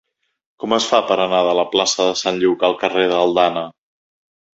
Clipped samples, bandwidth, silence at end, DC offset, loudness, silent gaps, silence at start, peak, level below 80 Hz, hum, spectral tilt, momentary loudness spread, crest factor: under 0.1%; 8 kHz; 0.9 s; under 0.1%; -17 LUFS; none; 0.6 s; 0 dBFS; -62 dBFS; none; -3 dB/octave; 4 LU; 18 dB